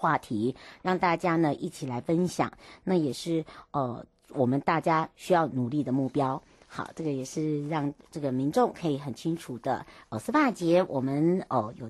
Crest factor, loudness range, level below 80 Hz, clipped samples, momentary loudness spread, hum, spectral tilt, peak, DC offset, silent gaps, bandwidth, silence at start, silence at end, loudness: 16 dB; 2 LU; -64 dBFS; under 0.1%; 10 LU; none; -6.5 dB/octave; -12 dBFS; under 0.1%; none; 12.5 kHz; 0 s; 0 s; -29 LUFS